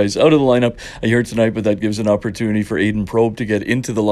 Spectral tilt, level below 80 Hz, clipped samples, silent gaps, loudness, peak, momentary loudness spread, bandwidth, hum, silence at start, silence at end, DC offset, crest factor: -6 dB/octave; -42 dBFS; under 0.1%; none; -17 LUFS; 0 dBFS; 7 LU; 13.5 kHz; none; 0 s; 0 s; under 0.1%; 16 dB